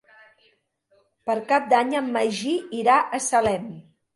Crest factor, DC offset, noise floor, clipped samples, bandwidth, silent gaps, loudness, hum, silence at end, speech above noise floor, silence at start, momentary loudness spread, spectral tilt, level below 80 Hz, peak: 18 dB; under 0.1%; -65 dBFS; under 0.1%; 11.5 kHz; none; -22 LUFS; none; 0.35 s; 43 dB; 1.25 s; 9 LU; -3.5 dB/octave; -62 dBFS; -6 dBFS